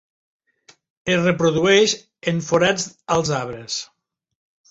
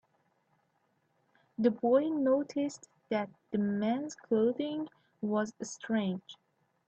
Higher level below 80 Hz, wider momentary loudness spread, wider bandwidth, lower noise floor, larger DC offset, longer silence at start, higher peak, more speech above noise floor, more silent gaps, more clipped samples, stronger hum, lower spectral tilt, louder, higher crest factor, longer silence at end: first, -56 dBFS vs -78 dBFS; about the same, 13 LU vs 12 LU; about the same, 8 kHz vs 8.6 kHz; second, -55 dBFS vs -75 dBFS; neither; second, 1.05 s vs 1.6 s; first, -4 dBFS vs -14 dBFS; second, 36 dB vs 44 dB; neither; neither; neither; second, -4 dB/octave vs -6 dB/octave; first, -20 LUFS vs -32 LUFS; about the same, 18 dB vs 18 dB; first, 0.85 s vs 0.55 s